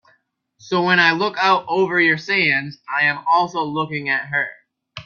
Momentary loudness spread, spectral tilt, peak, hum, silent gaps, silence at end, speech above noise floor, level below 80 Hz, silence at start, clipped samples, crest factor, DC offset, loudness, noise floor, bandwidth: 9 LU; -5 dB/octave; -2 dBFS; none; none; 0.05 s; 44 dB; -64 dBFS; 0.65 s; under 0.1%; 18 dB; under 0.1%; -18 LUFS; -63 dBFS; 7.2 kHz